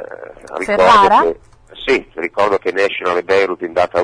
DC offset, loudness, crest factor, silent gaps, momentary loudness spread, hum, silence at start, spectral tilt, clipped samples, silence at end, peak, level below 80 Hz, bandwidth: under 0.1%; -14 LUFS; 14 dB; none; 18 LU; none; 0 s; -4 dB/octave; under 0.1%; 0 s; -2 dBFS; -46 dBFS; 10.5 kHz